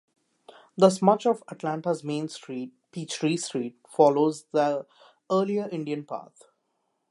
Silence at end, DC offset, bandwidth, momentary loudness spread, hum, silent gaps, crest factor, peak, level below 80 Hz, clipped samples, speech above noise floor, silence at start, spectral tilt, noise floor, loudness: 0.85 s; under 0.1%; 11.5 kHz; 16 LU; none; none; 22 dB; -4 dBFS; -78 dBFS; under 0.1%; 50 dB; 0.75 s; -5.5 dB/octave; -76 dBFS; -26 LUFS